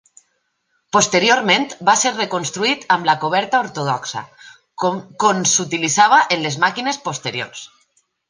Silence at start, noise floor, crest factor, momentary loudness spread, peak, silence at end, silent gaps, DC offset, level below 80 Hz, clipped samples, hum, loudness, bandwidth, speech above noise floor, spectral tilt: 0.95 s; -68 dBFS; 18 dB; 10 LU; 0 dBFS; 0.65 s; none; under 0.1%; -66 dBFS; under 0.1%; none; -17 LUFS; 10.5 kHz; 51 dB; -2 dB/octave